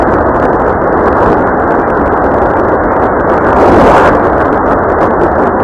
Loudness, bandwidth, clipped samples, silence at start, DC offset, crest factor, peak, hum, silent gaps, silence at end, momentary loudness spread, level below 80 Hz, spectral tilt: -8 LUFS; 11.5 kHz; 0.8%; 0 s; under 0.1%; 8 dB; 0 dBFS; none; none; 0 s; 4 LU; -24 dBFS; -8 dB/octave